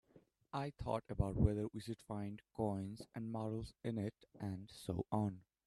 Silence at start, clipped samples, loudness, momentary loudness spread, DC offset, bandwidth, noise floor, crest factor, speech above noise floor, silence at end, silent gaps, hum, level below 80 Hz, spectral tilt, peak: 0.15 s; under 0.1%; -43 LUFS; 11 LU; under 0.1%; 13 kHz; -70 dBFS; 24 dB; 28 dB; 0.25 s; none; none; -54 dBFS; -8 dB/octave; -18 dBFS